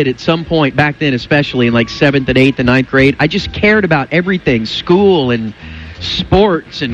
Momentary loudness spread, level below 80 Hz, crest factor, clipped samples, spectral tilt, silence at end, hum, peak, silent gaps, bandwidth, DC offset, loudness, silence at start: 8 LU; -34 dBFS; 12 dB; under 0.1%; -6.5 dB/octave; 0 s; none; 0 dBFS; none; 8.8 kHz; under 0.1%; -12 LUFS; 0 s